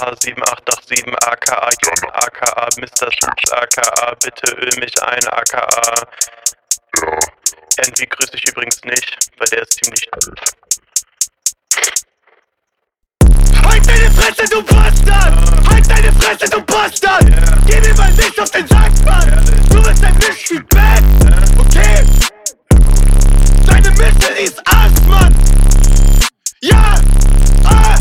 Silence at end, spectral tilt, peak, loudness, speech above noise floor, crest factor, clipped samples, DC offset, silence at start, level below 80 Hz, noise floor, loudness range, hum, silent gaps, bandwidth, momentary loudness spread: 0 s; -3.5 dB/octave; 0 dBFS; -12 LUFS; 63 dB; 8 dB; under 0.1%; under 0.1%; 0 s; -10 dBFS; -72 dBFS; 5 LU; none; none; 16 kHz; 7 LU